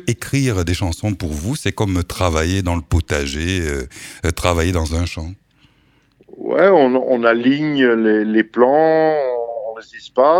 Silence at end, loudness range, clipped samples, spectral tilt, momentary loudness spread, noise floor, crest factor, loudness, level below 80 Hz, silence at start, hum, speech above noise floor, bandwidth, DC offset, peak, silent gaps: 0 s; 7 LU; under 0.1%; -6 dB/octave; 12 LU; -56 dBFS; 16 dB; -17 LUFS; -32 dBFS; 0.05 s; none; 40 dB; 16.5 kHz; under 0.1%; 0 dBFS; none